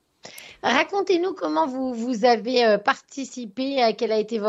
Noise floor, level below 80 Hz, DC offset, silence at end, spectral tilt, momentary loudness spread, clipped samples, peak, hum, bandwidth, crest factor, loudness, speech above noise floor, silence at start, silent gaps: -44 dBFS; -70 dBFS; under 0.1%; 0 s; -4 dB/octave; 14 LU; under 0.1%; -4 dBFS; none; 14.5 kHz; 18 dB; -22 LUFS; 22 dB; 0.25 s; none